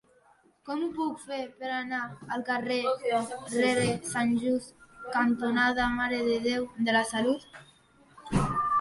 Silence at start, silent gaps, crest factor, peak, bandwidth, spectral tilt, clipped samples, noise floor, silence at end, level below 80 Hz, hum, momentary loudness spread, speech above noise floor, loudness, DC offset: 0.65 s; none; 16 dB; -14 dBFS; 11.5 kHz; -4.5 dB/octave; under 0.1%; -63 dBFS; 0 s; -52 dBFS; none; 10 LU; 34 dB; -29 LUFS; under 0.1%